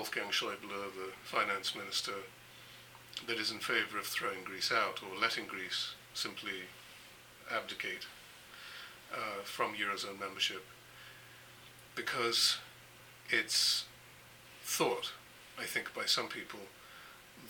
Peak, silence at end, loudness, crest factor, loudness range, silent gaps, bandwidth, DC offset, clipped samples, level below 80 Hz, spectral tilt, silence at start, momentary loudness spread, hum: -14 dBFS; 0 s; -35 LUFS; 24 dB; 7 LU; none; 19 kHz; under 0.1%; under 0.1%; -76 dBFS; -1 dB/octave; 0 s; 22 LU; none